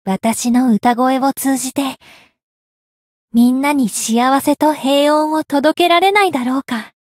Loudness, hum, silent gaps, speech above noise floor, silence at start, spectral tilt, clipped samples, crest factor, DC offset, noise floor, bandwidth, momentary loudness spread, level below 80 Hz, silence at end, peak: -14 LUFS; none; 2.43-3.28 s; over 76 dB; 0.05 s; -3.5 dB/octave; under 0.1%; 14 dB; under 0.1%; under -90 dBFS; 16.5 kHz; 7 LU; -60 dBFS; 0.15 s; -2 dBFS